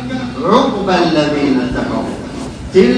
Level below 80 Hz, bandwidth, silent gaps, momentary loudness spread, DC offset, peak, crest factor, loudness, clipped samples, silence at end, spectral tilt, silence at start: -36 dBFS; 10.5 kHz; none; 12 LU; under 0.1%; 0 dBFS; 14 dB; -14 LUFS; 0.2%; 0 s; -6 dB/octave; 0 s